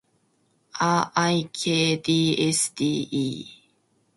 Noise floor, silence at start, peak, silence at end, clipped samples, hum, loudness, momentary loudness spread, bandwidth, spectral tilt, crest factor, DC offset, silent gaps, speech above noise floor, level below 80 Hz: -67 dBFS; 0.75 s; -6 dBFS; 0.65 s; under 0.1%; none; -23 LUFS; 9 LU; 11.5 kHz; -4 dB/octave; 18 dB; under 0.1%; none; 44 dB; -64 dBFS